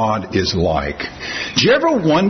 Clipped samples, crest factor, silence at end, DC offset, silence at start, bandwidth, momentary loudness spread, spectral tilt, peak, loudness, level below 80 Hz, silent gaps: under 0.1%; 16 dB; 0 s; under 0.1%; 0 s; 6.4 kHz; 11 LU; -5 dB/octave; -2 dBFS; -17 LUFS; -40 dBFS; none